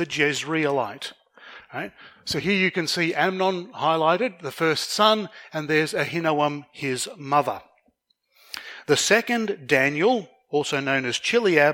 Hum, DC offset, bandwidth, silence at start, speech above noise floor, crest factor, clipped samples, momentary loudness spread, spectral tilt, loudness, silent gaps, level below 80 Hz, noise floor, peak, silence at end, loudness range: none; under 0.1%; 17 kHz; 0 s; 45 dB; 20 dB; under 0.1%; 15 LU; -3.5 dB/octave; -23 LUFS; none; -66 dBFS; -68 dBFS; -4 dBFS; 0 s; 4 LU